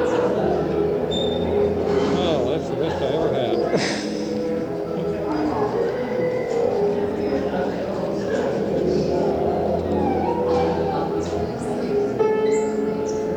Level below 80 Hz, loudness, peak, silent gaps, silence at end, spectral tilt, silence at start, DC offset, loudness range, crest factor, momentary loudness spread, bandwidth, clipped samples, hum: -46 dBFS; -22 LUFS; -8 dBFS; none; 0 s; -6.5 dB/octave; 0 s; under 0.1%; 2 LU; 14 dB; 5 LU; 10 kHz; under 0.1%; none